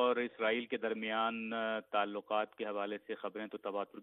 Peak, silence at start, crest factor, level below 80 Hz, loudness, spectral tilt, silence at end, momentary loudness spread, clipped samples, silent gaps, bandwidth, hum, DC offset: -20 dBFS; 0 s; 18 dB; -86 dBFS; -37 LUFS; -7 dB/octave; 0 s; 8 LU; under 0.1%; none; 4.1 kHz; none; under 0.1%